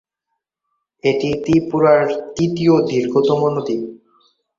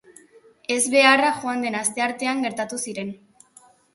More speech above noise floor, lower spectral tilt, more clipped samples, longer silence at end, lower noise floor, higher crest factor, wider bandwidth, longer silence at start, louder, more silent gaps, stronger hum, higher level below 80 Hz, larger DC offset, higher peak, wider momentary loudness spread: first, 61 dB vs 32 dB; first, -7 dB/octave vs -2 dB/octave; neither; second, 0.6 s vs 0.8 s; first, -77 dBFS vs -54 dBFS; second, 16 dB vs 22 dB; second, 7.6 kHz vs 12 kHz; first, 1.05 s vs 0.7 s; first, -17 LUFS vs -21 LUFS; neither; neither; first, -52 dBFS vs -70 dBFS; neither; about the same, -2 dBFS vs -2 dBFS; second, 8 LU vs 15 LU